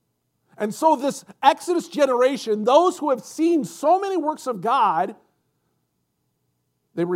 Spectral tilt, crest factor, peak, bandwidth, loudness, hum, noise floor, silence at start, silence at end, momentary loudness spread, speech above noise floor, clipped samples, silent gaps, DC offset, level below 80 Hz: -4.5 dB/octave; 20 dB; -2 dBFS; 16 kHz; -21 LUFS; none; -73 dBFS; 0.6 s; 0 s; 10 LU; 53 dB; under 0.1%; none; under 0.1%; -84 dBFS